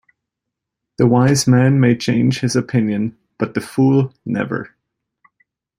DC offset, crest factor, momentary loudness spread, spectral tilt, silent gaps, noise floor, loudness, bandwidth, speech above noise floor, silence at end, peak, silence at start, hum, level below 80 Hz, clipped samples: under 0.1%; 16 dB; 11 LU; -6 dB/octave; none; -81 dBFS; -17 LUFS; 15.5 kHz; 66 dB; 1.1 s; -2 dBFS; 1 s; none; -54 dBFS; under 0.1%